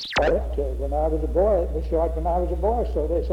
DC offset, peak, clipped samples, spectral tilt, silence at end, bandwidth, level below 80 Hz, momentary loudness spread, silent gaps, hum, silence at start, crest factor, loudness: under 0.1%; -10 dBFS; under 0.1%; -7 dB/octave; 0 s; 7.6 kHz; -28 dBFS; 4 LU; none; none; 0 s; 12 dB; -24 LUFS